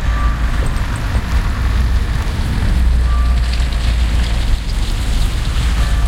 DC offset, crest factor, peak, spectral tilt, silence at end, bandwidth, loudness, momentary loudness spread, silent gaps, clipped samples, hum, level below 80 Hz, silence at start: under 0.1%; 12 dB; -2 dBFS; -5.5 dB/octave; 0 s; 13.5 kHz; -18 LUFS; 4 LU; none; under 0.1%; none; -14 dBFS; 0 s